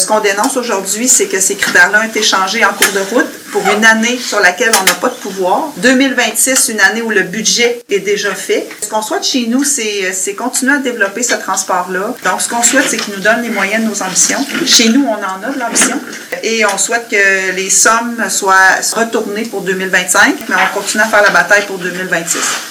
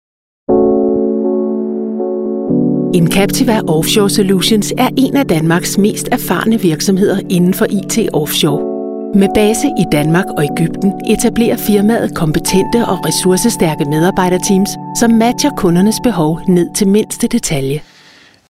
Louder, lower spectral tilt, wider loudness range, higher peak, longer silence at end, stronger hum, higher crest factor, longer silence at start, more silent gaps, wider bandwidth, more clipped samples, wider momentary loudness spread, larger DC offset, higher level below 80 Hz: about the same, -11 LUFS vs -13 LUFS; second, -1.5 dB/octave vs -5 dB/octave; about the same, 3 LU vs 1 LU; about the same, 0 dBFS vs 0 dBFS; second, 0 s vs 0.7 s; neither; about the same, 12 dB vs 12 dB; second, 0 s vs 0.5 s; neither; first, over 20 kHz vs 16.5 kHz; first, 0.7% vs under 0.1%; first, 8 LU vs 5 LU; neither; second, -58 dBFS vs -38 dBFS